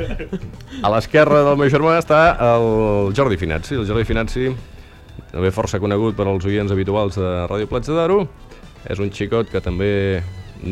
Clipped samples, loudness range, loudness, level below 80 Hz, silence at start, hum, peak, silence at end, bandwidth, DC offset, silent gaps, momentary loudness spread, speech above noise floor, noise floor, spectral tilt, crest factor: under 0.1%; 6 LU; -18 LUFS; -34 dBFS; 0 s; none; -2 dBFS; 0 s; 13 kHz; under 0.1%; none; 15 LU; 21 dB; -39 dBFS; -7 dB/octave; 16 dB